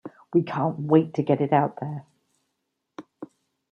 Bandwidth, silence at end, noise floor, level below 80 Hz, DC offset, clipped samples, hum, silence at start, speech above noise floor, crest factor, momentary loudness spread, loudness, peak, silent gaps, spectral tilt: 6.6 kHz; 0.45 s; -79 dBFS; -72 dBFS; under 0.1%; under 0.1%; none; 0.05 s; 56 dB; 20 dB; 23 LU; -24 LUFS; -6 dBFS; none; -9.5 dB/octave